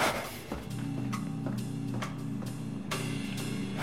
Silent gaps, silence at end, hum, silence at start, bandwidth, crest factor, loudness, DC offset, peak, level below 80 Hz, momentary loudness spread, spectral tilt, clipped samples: none; 0 s; none; 0 s; 16.5 kHz; 18 dB; -36 LUFS; 0.2%; -16 dBFS; -56 dBFS; 4 LU; -5 dB/octave; under 0.1%